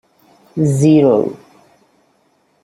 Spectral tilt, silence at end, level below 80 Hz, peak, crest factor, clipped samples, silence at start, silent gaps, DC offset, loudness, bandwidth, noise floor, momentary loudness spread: -8 dB/octave; 1.25 s; -54 dBFS; -2 dBFS; 14 dB; under 0.1%; 0.55 s; none; under 0.1%; -13 LUFS; 12.5 kHz; -59 dBFS; 14 LU